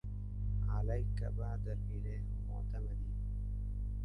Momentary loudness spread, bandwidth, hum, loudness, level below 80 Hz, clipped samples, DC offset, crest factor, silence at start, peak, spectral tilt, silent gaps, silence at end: 5 LU; 4.8 kHz; 50 Hz at -40 dBFS; -41 LUFS; -40 dBFS; under 0.1%; under 0.1%; 12 dB; 0.05 s; -24 dBFS; -9.5 dB/octave; none; 0 s